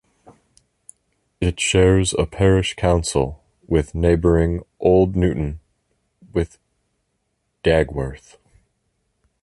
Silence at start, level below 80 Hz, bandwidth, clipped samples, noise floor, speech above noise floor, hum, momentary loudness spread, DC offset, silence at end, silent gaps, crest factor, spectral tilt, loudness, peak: 1.4 s; -32 dBFS; 11.5 kHz; under 0.1%; -72 dBFS; 54 dB; none; 11 LU; under 0.1%; 1.25 s; none; 18 dB; -5.5 dB/octave; -19 LUFS; -2 dBFS